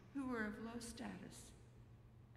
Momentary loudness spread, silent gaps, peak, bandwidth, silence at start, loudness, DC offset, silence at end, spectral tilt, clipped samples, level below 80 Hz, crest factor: 19 LU; none; -30 dBFS; 15.5 kHz; 0 s; -49 LUFS; under 0.1%; 0 s; -5 dB/octave; under 0.1%; -68 dBFS; 20 dB